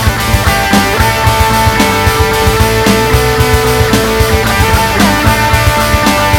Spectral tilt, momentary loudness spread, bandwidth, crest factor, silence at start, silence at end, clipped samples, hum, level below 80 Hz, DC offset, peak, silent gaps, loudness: -4.5 dB/octave; 1 LU; over 20 kHz; 8 dB; 0 s; 0 s; 0.7%; none; -18 dBFS; 0.1%; 0 dBFS; none; -9 LUFS